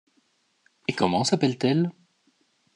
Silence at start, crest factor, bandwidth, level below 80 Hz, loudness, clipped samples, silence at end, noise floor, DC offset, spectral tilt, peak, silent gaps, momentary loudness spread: 0.9 s; 20 dB; 11 kHz; -68 dBFS; -25 LUFS; under 0.1%; 0.85 s; -68 dBFS; under 0.1%; -5.5 dB/octave; -6 dBFS; none; 9 LU